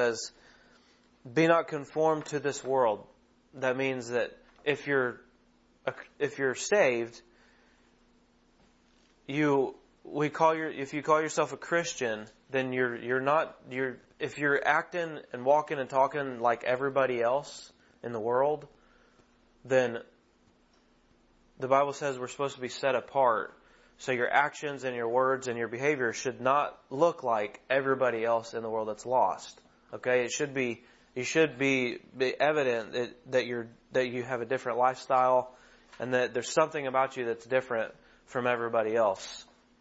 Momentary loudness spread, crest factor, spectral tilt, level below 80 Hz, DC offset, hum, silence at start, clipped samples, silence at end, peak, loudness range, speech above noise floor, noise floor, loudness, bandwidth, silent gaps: 11 LU; 22 dB; -4.5 dB/octave; -70 dBFS; under 0.1%; none; 0 s; under 0.1%; 0.35 s; -10 dBFS; 4 LU; 36 dB; -65 dBFS; -30 LUFS; 8 kHz; none